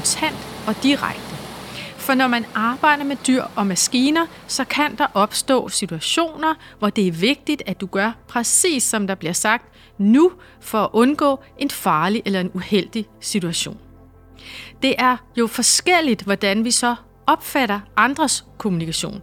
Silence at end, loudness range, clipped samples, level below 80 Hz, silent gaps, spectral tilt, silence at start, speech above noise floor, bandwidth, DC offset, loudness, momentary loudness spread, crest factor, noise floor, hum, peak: 0 s; 3 LU; under 0.1%; -52 dBFS; none; -3 dB/octave; 0 s; 26 dB; 18.5 kHz; under 0.1%; -19 LUFS; 9 LU; 18 dB; -46 dBFS; none; -2 dBFS